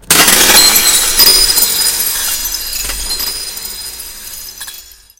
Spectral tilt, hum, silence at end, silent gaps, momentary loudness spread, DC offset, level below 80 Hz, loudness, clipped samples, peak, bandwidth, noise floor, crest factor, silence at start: 0.5 dB/octave; none; 0.35 s; none; 21 LU; under 0.1%; -32 dBFS; -8 LUFS; 0.9%; 0 dBFS; over 20 kHz; -34 dBFS; 12 dB; 0.1 s